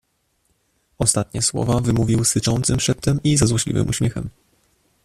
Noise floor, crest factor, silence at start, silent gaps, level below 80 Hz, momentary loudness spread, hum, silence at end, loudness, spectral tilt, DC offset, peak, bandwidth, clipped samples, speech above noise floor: -67 dBFS; 20 dB; 1 s; none; -40 dBFS; 5 LU; none; 0.75 s; -19 LUFS; -4.5 dB/octave; under 0.1%; 0 dBFS; 14 kHz; under 0.1%; 48 dB